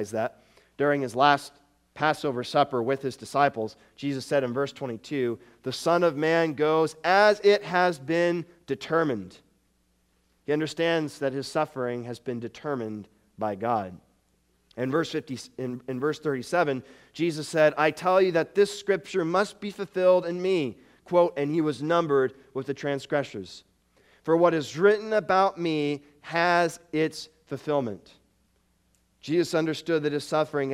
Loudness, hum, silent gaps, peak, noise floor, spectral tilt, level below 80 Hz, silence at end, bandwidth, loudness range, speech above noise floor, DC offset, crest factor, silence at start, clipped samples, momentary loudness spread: -26 LUFS; none; none; -4 dBFS; -69 dBFS; -5.5 dB/octave; -70 dBFS; 0 s; 15 kHz; 7 LU; 43 dB; under 0.1%; 22 dB; 0 s; under 0.1%; 13 LU